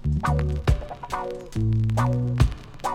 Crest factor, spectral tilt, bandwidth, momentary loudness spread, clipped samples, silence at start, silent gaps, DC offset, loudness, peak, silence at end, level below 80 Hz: 18 dB; -7.5 dB/octave; 13 kHz; 9 LU; under 0.1%; 0 s; none; under 0.1%; -25 LUFS; -6 dBFS; 0 s; -30 dBFS